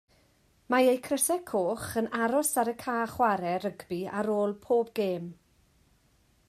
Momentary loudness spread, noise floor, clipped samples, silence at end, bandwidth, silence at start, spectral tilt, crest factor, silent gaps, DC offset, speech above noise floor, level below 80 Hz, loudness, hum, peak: 8 LU; -66 dBFS; under 0.1%; 1.15 s; 15 kHz; 0.7 s; -4 dB/octave; 18 dB; none; under 0.1%; 38 dB; -66 dBFS; -29 LUFS; none; -12 dBFS